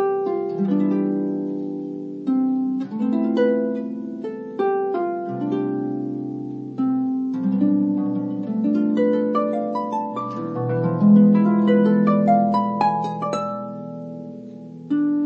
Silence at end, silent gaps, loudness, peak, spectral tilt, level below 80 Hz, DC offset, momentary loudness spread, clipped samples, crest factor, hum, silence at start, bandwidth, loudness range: 0 s; none; -21 LUFS; -4 dBFS; -9.5 dB/octave; -74 dBFS; under 0.1%; 14 LU; under 0.1%; 16 dB; none; 0 s; 7 kHz; 6 LU